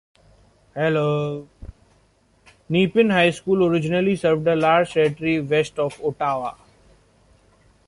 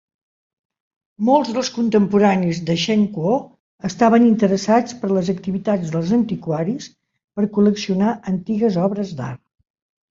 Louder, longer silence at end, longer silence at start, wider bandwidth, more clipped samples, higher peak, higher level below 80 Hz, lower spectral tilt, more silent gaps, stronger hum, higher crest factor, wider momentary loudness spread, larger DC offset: about the same, -20 LUFS vs -19 LUFS; first, 1.35 s vs 0.75 s; second, 0.75 s vs 1.2 s; first, 11.5 kHz vs 7.6 kHz; neither; about the same, -4 dBFS vs -2 dBFS; about the same, -52 dBFS vs -56 dBFS; about the same, -6.5 dB/octave vs -6.5 dB/octave; second, none vs 3.60-3.79 s, 7.24-7.28 s; neither; about the same, 18 dB vs 16 dB; second, 8 LU vs 12 LU; neither